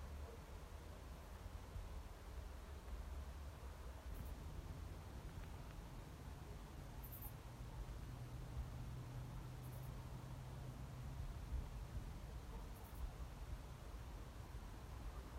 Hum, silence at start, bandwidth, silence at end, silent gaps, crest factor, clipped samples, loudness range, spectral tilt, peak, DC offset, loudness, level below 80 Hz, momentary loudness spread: none; 0 s; 16 kHz; 0 s; none; 16 dB; under 0.1%; 2 LU; -6 dB/octave; -36 dBFS; under 0.1%; -54 LUFS; -54 dBFS; 4 LU